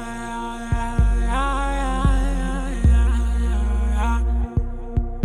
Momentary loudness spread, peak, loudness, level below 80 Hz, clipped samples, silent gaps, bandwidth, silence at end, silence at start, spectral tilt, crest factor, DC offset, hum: 8 LU; -6 dBFS; -23 LUFS; -20 dBFS; under 0.1%; none; 11 kHz; 0 s; 0 s; -6.5 dB/octave; 14 dB; under 0.1%; none